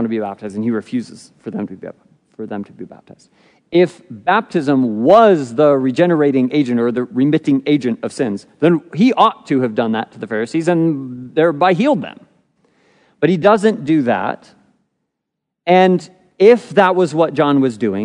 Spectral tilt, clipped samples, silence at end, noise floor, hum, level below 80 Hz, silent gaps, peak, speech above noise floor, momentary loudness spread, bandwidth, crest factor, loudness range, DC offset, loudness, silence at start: -7 dB/octave; under 0.1%; 0 s; -78 dBFS; none; -66 dBFS; none; 0 dBFS; 63 dB; 15 LU; 10.5 kHz; 16 dB; 8 LU; under 0.1%; -15 LUFS; 0 s